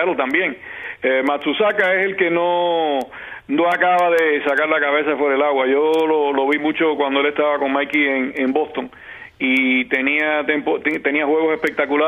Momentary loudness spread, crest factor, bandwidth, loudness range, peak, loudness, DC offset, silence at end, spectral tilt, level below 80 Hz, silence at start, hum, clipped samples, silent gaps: 8 LU; 16 dB; 14.5 kHz; 2 LU; -2 dBFS; -18 LUFS; under 0.1%; 0 s; -5.5 dB/octave; -62 dBFS; 0 s; none; under 0.1%; none